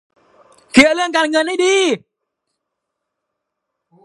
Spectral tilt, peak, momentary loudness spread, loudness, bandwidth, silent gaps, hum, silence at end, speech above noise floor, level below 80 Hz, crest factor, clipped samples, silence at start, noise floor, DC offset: -2.5 dB/octave; 0 dBFS; 6 LU; -14 LUFS; 16 kHz; none; none; 2.1 s; 64 dB; -58 dBFS; 18 dB; under 0.1%; 0.75 s; -77 dBFS; under 0.1%